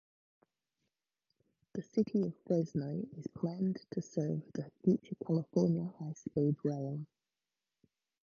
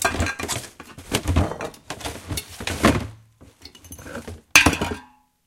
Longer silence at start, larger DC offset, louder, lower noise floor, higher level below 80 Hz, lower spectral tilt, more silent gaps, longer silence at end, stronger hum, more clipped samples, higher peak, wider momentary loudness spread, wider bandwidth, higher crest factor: first, 1.75 s vs 0 s; neither; second, -36 LUFS vs -22 LUFS; first, under -90 dBFS vs -50 dBFS; second, -74 dBFS vs -36 dBFS; first, -9 dB/octave vs -3.5 dB/octave; neither; first, 1.2 s vs 0.4 s; neither; neither; second, -18 dBFS vs 0 dBFS; second, 12 LU vs 22 LU; second, 7.2 kHz vs 17 kHz; second, 18 dB vs 24 dB